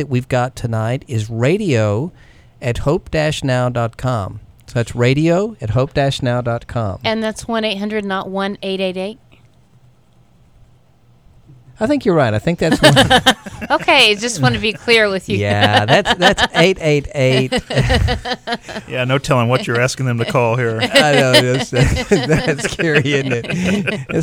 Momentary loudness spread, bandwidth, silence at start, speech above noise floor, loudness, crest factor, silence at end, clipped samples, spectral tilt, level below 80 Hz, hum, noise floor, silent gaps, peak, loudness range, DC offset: 11 LU; 17 kHz; 0 s; 36 dB; -15 LUFS; 16 dB; 0 s; under 0.1%; -5 dB/octave; -34 dBFS; none; -51 dBFS; none; 0 dBFS; 9 LU; 0.2%